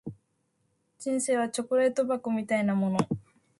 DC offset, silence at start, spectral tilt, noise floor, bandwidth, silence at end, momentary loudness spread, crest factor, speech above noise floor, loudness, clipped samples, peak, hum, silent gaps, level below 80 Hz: under 0.1%; 0.05 s; -5.5 dB/octave; -74 dBFS; 11.5 kHz; 0.4 s; 9 LU; 18 dB; 47 dB; -28 LUFS; under 0.1%; -10 dBFS; none; none; -66 dBFS